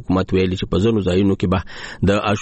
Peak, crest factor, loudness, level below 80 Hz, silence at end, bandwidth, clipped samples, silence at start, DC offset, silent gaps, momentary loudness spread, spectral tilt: -6 dBFS; 12 dB; -19 LUFS; -38 dBFS; 0 s; 8.6 kHz; under 0.1%; 0 s; under 0.1%; none; 5 LU; -7 dB/octave